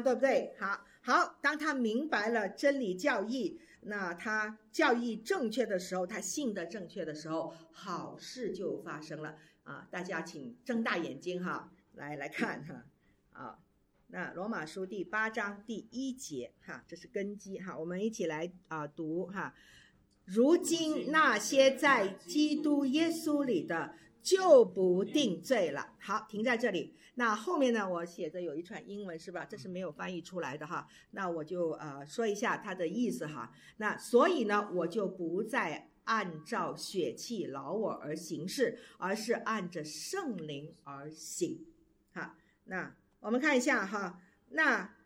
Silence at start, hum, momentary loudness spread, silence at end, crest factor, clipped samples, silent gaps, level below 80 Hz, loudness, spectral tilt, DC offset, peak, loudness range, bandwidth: 0 s; none; 16 LU; 0.15 s; 24 dB; under 0.1%; none; -76 dBFS; -34 LUFS; -4 dB/octave; under 0.1%; -12 dBFS; 11 LU; 17 kHz